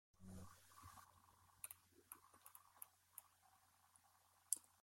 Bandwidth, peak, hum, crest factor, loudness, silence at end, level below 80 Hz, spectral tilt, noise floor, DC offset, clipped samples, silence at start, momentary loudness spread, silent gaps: 16.5 kHz; -16 dBFS; none; 44 dB; -56 LUFS; 0 s; -82 dBFS; -2 dB/octave; -76 dBFS; under 0.1%; under 0.1%; 0.15 s; 18 LU; none